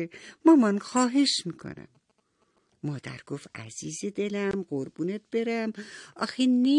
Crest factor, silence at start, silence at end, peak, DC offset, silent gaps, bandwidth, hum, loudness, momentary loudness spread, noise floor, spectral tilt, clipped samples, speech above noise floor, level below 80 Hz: 20 dB; 0 s; 0 s; -8 dBFS; under 0.1%; none; 11 kHz; none; -27 LUFS; 18 LU; -71 dBFS; -4.5 dB/octave; under 0.1%; 44 dB; -70 dBFS